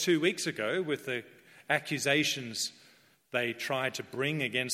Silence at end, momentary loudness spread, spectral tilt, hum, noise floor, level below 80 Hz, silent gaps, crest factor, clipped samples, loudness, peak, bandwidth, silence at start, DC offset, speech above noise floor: 0 s; 8 LU; -3.5 dB/octave; none; -62 dBFS; -78 dBFS; none; 20 dB; under 0.1%; -31 LUFS; -12 dBFS; 16 kHz; 0 s; under 0.1%; 31 dB